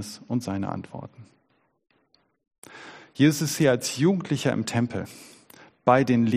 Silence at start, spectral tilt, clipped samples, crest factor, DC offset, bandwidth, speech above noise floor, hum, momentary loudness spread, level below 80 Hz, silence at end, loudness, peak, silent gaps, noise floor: 0 s; -5.5 dB/octave; under 0.1%; 22 dB; under 0.1%; 15.5 kHz; 45 dB; none; 22 LU; -64 dBFS; 0 s; -24 LUFS; -4 dBFS; 2.58-2.62 s; -69 dBFS